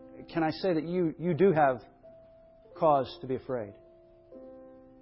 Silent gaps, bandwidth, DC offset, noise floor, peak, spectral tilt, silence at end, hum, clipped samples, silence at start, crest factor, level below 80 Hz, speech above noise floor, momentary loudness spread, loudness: none; 5.8 kHz; under 0.1%; -57 dBFS; -12 dBFS; -11 dB/octave; 0.25 s; none; under 0.1%; 0 s; 20 dB; -64 dBFS; 29 dB; 19 LU; -29 LUFS